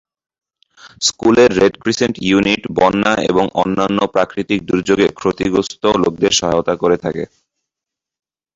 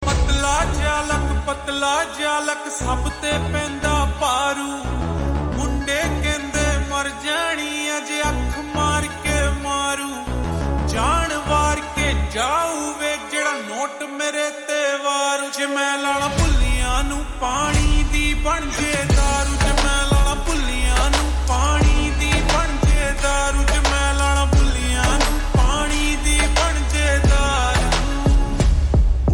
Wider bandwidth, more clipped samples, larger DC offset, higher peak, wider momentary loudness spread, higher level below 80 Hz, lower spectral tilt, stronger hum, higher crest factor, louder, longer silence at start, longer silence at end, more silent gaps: second, 8 kHz vs 18.5 kHz; neither; neither; first, 0 dBFS vs -6 dBFS; about the same, 6 LU vs 5 LU; second, -46 dBFS vs -22 dBFS; about the same, -4 dB/octave vs -4 dB/octave; neither; about the same, 16 dB vs 14 dB; first, -15 LUFS vs -20 LUFS; first, 0.85 s vs 0 s; first, 1.3 s vs 0 s; neither